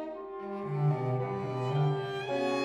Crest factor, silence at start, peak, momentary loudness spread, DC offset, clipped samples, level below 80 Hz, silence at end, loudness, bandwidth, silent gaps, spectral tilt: 14 dB; 0 s; -18 dBFS; 9 LU; under 0.1%; under 0.1%; -70 dBFS; 0 s; -32 LUFS; 8.4 kHz; none; -7.5 dB/octave